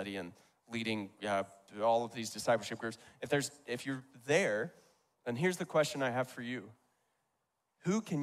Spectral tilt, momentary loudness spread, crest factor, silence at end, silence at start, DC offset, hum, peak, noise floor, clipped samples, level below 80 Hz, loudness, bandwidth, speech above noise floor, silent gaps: -4.5 dB/octave; 12 LU; 20 dB; 0 s; 0 s; under 0.1%; none; -16 dBFS; -83 dBFS; under 0.1%; -78 dBFS; -36 LUFS; 15.5 kHz; 48 dB; none